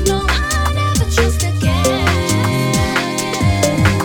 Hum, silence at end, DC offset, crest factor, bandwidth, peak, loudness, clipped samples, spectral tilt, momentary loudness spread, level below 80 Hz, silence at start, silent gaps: none; 0 s; under 0.1%; 14 dB; 18 kHz; 0 dBFS; -15 LUFS; under 0.1%; -4.5 dB/octave; 2 LU; -24 dBFS; 0 s; none